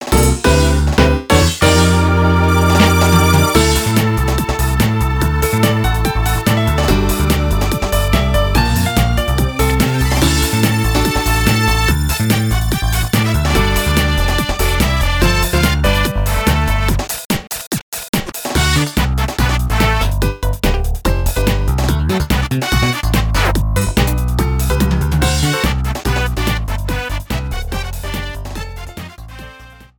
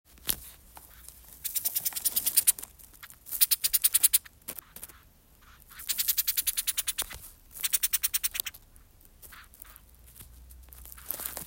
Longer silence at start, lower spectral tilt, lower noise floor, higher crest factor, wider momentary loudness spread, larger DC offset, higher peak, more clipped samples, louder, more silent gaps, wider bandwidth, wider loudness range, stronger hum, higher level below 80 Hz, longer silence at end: second, 0 s vs 0.25 s; first, -5 dB/octave vs 1.5 dB/octave; second, -38 dBFS vs -58 dBFS; second, 14 dB vs 30 dB; second, 9 LU vs 26 LU; neither; about the same, 0 dBFS vs -2 dBFS; neither; first, -15 LUFS vs -26 LUFS; first, 17.25-17.30 s, 17.67-17.71 s, 17.83-17.92 s, 18.09-18.13 s vs none; about the same, 19.5 kHz vs 19 kHz; about the same, 5 LU vs 7 LU; neither; first, -18 dBFS vs -56 dBFS; first, 0.15 s vs 0 s